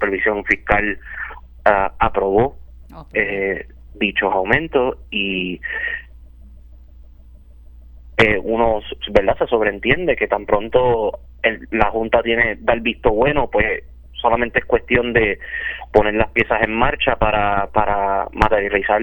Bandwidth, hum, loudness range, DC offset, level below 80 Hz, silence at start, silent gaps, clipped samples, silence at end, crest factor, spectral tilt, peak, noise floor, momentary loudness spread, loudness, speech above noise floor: 19 kHz; none; 5 LU; under 0.1%; -34 dBFS; 0 s; none; under 0.1%; 0 s; 18 dB; -7 dB/octave; 0 dBFS; -42 dBFS; 7 LU; -18 LUFS; 24 dB